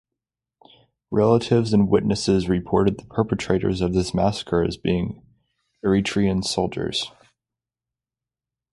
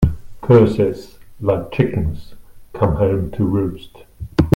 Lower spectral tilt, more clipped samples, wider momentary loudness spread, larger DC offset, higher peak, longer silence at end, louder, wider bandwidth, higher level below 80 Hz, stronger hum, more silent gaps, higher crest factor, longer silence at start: second, -6 dB/octave vs -9 dB/octave; neither; second, 7 LU vs 21 LU; neither; second, -4 dBFS vs 0 dBFS; first, 1.65 s vs 0 s; second, -22 LUFS vs -18 LUFS; second, 11.5 kHz vs 16.5 kHz; second, -44 dBFS vs -32 dBFS; neither; neither; about the same, 18 dB vs 16 dB; first, 1.1 s vs 0 s